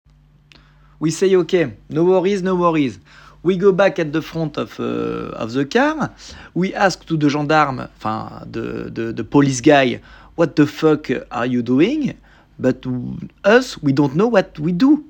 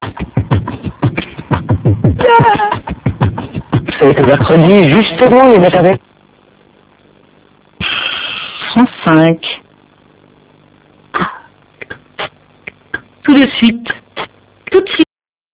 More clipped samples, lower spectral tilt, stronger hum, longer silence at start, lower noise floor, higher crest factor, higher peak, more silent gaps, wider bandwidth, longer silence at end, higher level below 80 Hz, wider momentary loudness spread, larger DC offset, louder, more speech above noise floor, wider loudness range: second, under 0.1% vs 1%; second, -6 dB/octave vs -10.5 dB/octave; second, none vs 50 Hz at -40 dBFS; first, 1 s vs 0 s; about the same, -50 dBFS vs -47 dBFS; first, 18 dB vs 12 dB; about the same, 0 dBFS vs 0 dBFS; neither; first, 17.5 kHz vs 4 kHz; second, 0.05 s vs 0.5 s; second, -48 dBFS vs -34 dBFS; second, 11 LU vs 18 LU; neither; second, -18 LUFS vs -11 LUFS; second, 33 dB vs 39 dB; second, 3 LU vs 9 LU